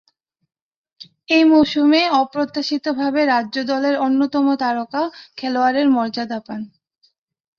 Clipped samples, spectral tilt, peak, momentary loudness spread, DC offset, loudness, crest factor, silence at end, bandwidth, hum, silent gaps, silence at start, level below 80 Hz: under 0.1%; -4.5 dB/octave; -2 dBFS; 12 LU; under 0.1%; -18 LUFS; 18 dB; 0.9 s; 6.8 kHz; none; none; 1 s; -60 dBFS